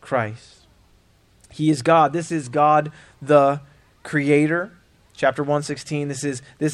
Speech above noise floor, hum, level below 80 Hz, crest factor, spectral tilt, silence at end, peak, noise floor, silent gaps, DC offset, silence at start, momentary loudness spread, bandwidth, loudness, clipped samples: 36 dB; none; -60 dBFS; 18 dB; -6 dB/octave; 0 s; -2 dBFS; -56 dBFS; none; under 0.1%; 0.05 s; 14 LU; 12 kHz; -20 LUFS; under 0.1%